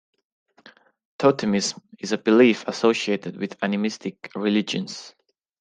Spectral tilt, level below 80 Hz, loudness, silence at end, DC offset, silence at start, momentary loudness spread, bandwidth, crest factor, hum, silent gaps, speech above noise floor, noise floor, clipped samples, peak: -4.5 dB/octave; -68 dBFS; -22 LUFS; 0.5 s; under 0.1%; 1.2 s; 16 LU; 9.6 kHz; 20 dB; none; none; 31 dB; -53 dBFS; under 0.1%; -4 dBFS